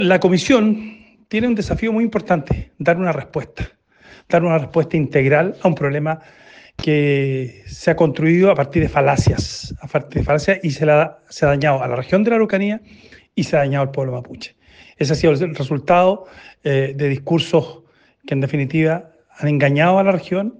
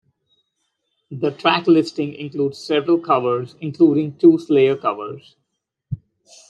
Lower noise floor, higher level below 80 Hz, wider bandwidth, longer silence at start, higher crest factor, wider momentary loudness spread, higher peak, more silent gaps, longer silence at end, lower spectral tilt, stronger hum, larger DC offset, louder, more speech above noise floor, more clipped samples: second, -47 dBFS vs -74 dBFS; first, -40 dBFS vs -62 dBFS; about the same, 9.2 kHz vs 8.8 kHz; second, 0 s vs 1.1 s; about the same, 16 dB vs 18 dB; second, 12 LU vs 18 LU; about the same, 0 dBFS vs -2 dBFS; neither; second, 0.1 s vs 0.55 s; about the same, -7 dB/octave vs -7 dB/octave; neither; neither; about the same, -18 LUFS vs -18 LUFS; second, 30 dB vs 56 dB; neither